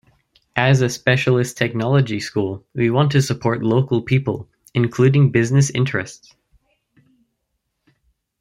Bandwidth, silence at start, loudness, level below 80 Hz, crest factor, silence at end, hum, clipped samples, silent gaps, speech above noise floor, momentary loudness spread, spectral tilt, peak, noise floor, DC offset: 12.5 kHz; 0.55 s; -18 LUFS; -54 dBFS; 18 dB; 2.25 s; none; under 0.1%; none; 57 dB; 10 LU; -6 dB/octave; 0 dBFS; -74 dBFS; under 0.1%